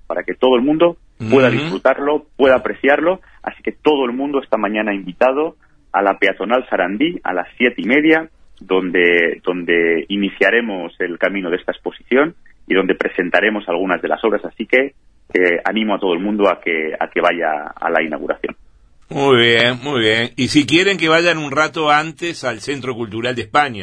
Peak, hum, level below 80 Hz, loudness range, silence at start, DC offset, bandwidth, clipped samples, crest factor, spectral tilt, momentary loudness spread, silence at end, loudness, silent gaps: 0 dBFS; none; -52 dBFS; 3 LU; 0.1 s; 0.1%; 10.5 kHz; under 0.1%; 16 dB; -5 dB/octave; 10 LU; 0 s; -16 LUFS; none